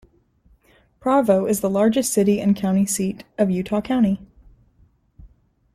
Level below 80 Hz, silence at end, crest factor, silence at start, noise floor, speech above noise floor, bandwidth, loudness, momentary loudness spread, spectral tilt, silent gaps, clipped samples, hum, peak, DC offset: -52 dBFS; 0.5 s; 16 dB; 1.05 s; -58 dBFS; 39 dB; 14.5 kHz; -20 LUFS; 6 LU; -6 dB/octave; none; under 0.1%; none; -4 dBFS; under 0.1%